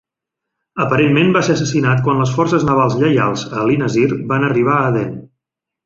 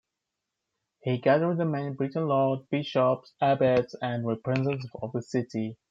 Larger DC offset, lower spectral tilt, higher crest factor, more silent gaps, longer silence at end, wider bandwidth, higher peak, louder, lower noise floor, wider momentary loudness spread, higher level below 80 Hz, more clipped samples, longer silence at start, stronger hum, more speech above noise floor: neither; second, -6.5 dB/octave vs -8 dB/octave; about the same, 14 dB vs 18 dB; neither; first, 0.6 s vs 0.15 s; about the same, 7.8 kHz vs 7.8 kHz; first, -2 dBFS vs -10 dBFS; first, -15 LUFS vs -28 LUFS; second, -81 dBFS vs -85 dBFS; second, 6 LU vs 10 LU; first, -48 dBFS vs -68 dBFS; neither; second, 0.75 s vs 1.05 s; neither; first, 67 dB vs 58 dB